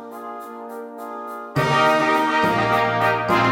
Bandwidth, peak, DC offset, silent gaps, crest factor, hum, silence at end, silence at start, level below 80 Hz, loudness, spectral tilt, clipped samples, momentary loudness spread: 17 kHz; -4 dBFS; under 0.1%; none; 16 dB; none; 0 s; 0 s; -54 dBFS; -18 LUFS; -5.5 dB/octave; under 0.1%; 17 LU